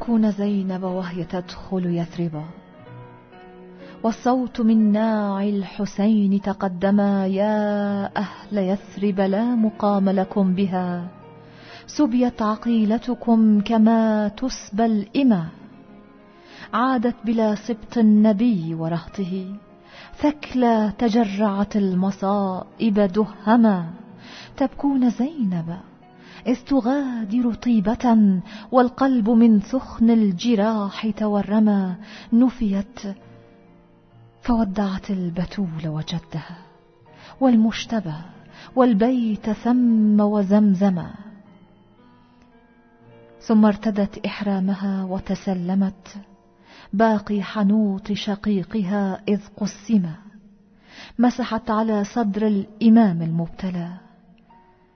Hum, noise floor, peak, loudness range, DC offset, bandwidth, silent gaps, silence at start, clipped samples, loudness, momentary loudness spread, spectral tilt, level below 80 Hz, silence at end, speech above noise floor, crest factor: none; -53 dBFS; -4 dBFS; 6 LU; under 0.1%; 6.6 kHz; none; 0 s; under 0.1%; -21 LUFS; 12 LU; -7.5 dB/octave; -50 dBFS; 0.95 s; 33 dB; 18 dB